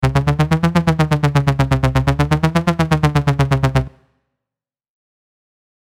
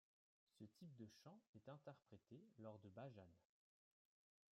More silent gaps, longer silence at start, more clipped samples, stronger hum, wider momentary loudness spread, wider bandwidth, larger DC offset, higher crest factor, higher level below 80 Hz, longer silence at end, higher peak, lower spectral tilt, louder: second, none vs 1.47-1.53 s; second, 0 s vs 0.55 s; neither; neither; second, 2 LU vs 7 LU; first, 13.5 kHz vs 11.5 kHz; neither; about the same, 16 dB vs 20 dB; first, -30 dBFS vs under -90 dBFS; first, 1.9 s vs 1.1 s; first, -2 dBFS vs -44 dBFS; about the same, -7 dB/octave vs -7 dB/octave; first, -16 LUFS vs -64 LUFS